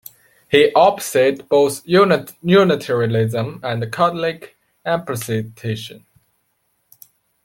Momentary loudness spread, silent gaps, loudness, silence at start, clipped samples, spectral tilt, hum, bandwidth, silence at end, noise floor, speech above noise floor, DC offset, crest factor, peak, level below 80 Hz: 13 LU; none; -17 LUFS; 0.5 s; under 0.1%; -5.5 dB/octave; none; 17 kHz; 1.5 s; -67 dBFS; 50 dB; under 0.1%; 18 dB; -2 dBFS; -58 dBFS